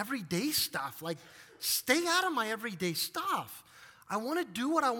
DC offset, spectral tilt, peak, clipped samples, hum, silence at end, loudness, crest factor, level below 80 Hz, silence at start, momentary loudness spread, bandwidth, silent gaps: under 0.1%; -2.5 dB/octave; -12 dBFS; under 0.1%; none; 0 s; -32 LUFS; 22 dB; -74 dBFS; 0 s; 12 LU; 18 kHz; none